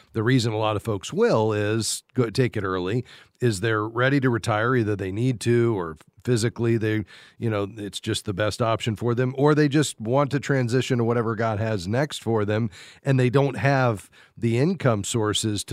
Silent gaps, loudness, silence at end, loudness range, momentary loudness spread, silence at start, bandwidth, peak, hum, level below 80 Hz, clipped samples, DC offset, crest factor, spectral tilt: none; -24 LUFS; 0 s; 3 LU; 7 LU; 0.15 s; 15 kHz; -4 dBFS; none; -58 dBFS; under 0.1%; under 0.1%; 18 dB; -5.5 dB/octave